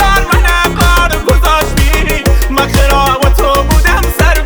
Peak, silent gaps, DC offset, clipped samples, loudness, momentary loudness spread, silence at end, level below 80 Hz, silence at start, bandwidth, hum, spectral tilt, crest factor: 0 dBFS; none; under 0.1%; under 0.1%; -10 LUFS; 2 LU; 0 s; -12 dBFS; 0 s; over 20 kHz; none; -4.5 dB/octave; 8 dB